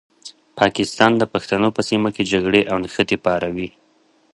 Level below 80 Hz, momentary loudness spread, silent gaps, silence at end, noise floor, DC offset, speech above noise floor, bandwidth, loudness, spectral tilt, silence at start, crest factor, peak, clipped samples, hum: -50 dBFS; 8 LU; none; 0.65 s; -58 dBFS; under 0.1%; 40 dB; 11.5 kHz; -18 LUFS; -5 dB/octave; 0.25 s; 20 dB; 0 dBFS; under 0.1%; none